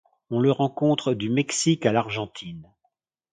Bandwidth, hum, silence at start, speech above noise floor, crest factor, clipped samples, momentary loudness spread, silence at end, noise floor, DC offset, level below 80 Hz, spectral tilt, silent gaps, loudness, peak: 9.6 kHz; none; 0.3 s; 51 dB; 20 dB; under 0.1%; 15 LU; 0.7 s; -74 dBFS; under 0.1%; -62 dBFS; -5 dB/octave; none; -23 LUFS; -4 dBFS